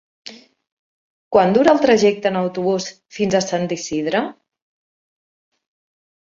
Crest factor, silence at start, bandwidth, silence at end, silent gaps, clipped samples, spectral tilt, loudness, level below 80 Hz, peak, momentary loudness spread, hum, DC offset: 20 dB; 0.25 s; 7.8 kHz; 1.9 s; 0.72-1.31 s; under 0.1%; -5 dB/octave; -18 LUFS; -60 dBFS; 0 dBFS; 17 LU; none; under 0.1%